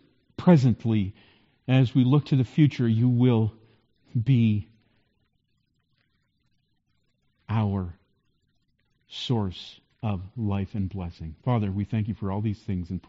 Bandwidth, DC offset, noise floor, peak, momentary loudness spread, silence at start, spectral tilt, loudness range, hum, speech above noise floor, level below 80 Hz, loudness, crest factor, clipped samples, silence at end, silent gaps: 7.6 kHz; under 0.1%; -73 dBFS; -6 dBFS; 14 LU; 0.4 s; -8 dB/octave; 12 LU; none; 49 dB; -54 dBFS; -25 LUFS; 20 dB; under 0.1%; 0.1 s; none